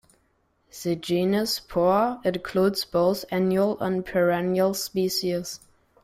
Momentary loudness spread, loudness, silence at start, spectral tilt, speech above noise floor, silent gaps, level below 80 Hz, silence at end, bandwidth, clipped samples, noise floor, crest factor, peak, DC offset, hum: 7 LU; -24 LUFS; 0.75 s; -5 dB/octave; 44 dB; none; -58 dBFS; 0.45 s; 16 kHz; under 0.1%; -68 dBFS; 16 dB; -10 dBFS; under 0.1%; none